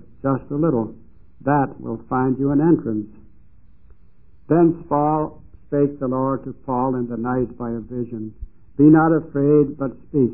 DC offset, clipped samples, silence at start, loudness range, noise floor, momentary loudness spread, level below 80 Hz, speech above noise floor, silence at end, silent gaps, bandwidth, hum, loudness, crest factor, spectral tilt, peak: 0.7%; under 0.1%; 0.25 s; 4 LU; -53 dBFS; 12 LU; -48 dBFS; 34 dB; 0 s; none; 2.8 kHz; none; -20 LUFS; 18 dB; -15.5 dB/octave; -2 dBFS